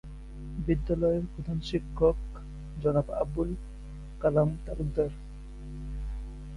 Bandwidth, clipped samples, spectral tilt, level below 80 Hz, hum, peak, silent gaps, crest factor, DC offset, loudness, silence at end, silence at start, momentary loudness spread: 11 kHz; under 0.1%; -8.5 dB/octave; -38 dBFS; none; -12 dBFS; none; 20 dB; under 0.1%; -30 LUFS; 0 s; 0.05 s; 18 LU